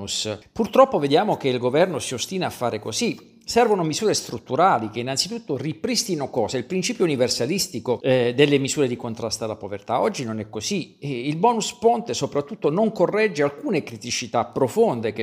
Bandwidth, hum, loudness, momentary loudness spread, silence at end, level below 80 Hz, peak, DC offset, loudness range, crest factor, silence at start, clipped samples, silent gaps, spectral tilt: 15.5 kHz; none; -22 LUFS; 9 LU; 0 s; -60 dBFS; 0 dBFS; under 0.1%; 2 LU; 22 dB; 0 s; under 0.1%; none; -4 dB/octave